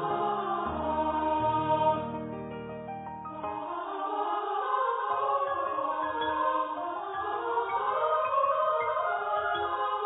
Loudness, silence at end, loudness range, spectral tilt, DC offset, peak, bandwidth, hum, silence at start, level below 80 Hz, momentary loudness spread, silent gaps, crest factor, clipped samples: -30 LUFS; 0 s; 3 LU; -9 dB/octave; under 0.1%; -14 dBFS; 4 kHz; none; 0 s; -58 dBFS; 11 LU; none; 16 dB; under 0.1%